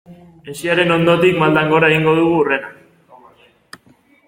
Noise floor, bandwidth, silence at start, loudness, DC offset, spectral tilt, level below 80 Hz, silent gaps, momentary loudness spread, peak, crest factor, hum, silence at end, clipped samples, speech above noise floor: -52 dBFS; 16.5 kHz; 0.1 s; -14 LUFS; under 0.1%; -6 dB/octave; -54 dBFS; none; 11 LU; -2 dBFS; 16 dB; none; 1.55 s; under 0.1%; 38 dB